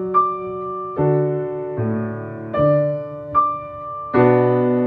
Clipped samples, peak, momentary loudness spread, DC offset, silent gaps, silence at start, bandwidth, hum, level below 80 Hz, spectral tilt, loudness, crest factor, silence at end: under 0.1%; -4 dBFS; 12 LU; under 0.1%; none; 0 s; 4.5 kHz; none; -52 dBFS; -11.5 dB/octave; -20 LUFS; 16 dB; 0 s